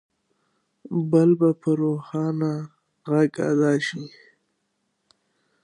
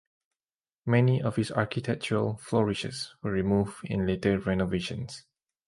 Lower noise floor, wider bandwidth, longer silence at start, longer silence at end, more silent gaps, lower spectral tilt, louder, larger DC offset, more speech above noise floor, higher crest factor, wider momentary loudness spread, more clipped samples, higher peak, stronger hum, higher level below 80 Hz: second, -74 dBFS vs under -90 dBFS; about the same, 10.5 kHz vs 11.5 kHz; about the same, 0.9 s vs 0.85 s; first, 1.55 s vs 0.5 s; neither; about the same, -7.5 dB/octave vs -6.5 dB/octave; first, -22 LUFS vs -28 LUFS; neither; second, 53 dB vs over 62 dB; about the same, 18 dB vs 20 dB; first, 17 LU vs 10 LU; neither; first, -6 dBFS vs -10 dBFS; neither; second, -74 dBFS vs -52 dBFS